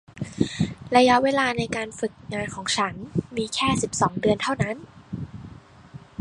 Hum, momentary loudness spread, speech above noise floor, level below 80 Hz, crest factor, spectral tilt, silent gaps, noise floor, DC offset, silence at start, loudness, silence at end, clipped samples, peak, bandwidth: none; 18 LU; 22 dB; -50 dBFS; 22 dB; -4.5 dB/octave; none; -45 dBFS; under 0.1%; 0.15 s; -24 LUFS; 0.25 s; under 0.1%; -4 dBFS; 11.5 kHz